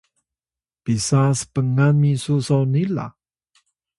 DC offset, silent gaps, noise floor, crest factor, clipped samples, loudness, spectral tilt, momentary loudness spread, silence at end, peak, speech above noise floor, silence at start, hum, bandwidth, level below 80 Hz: under 0.1%; none; under -90 dBFS; 16 dB; under 0.1%; -19 LUFS; -6.5 dB/octave; 10 LU; 0.9 s; -6 dBFS; over 72 dB; 0.85 s; none; 11.5 kHz; -54 dBFS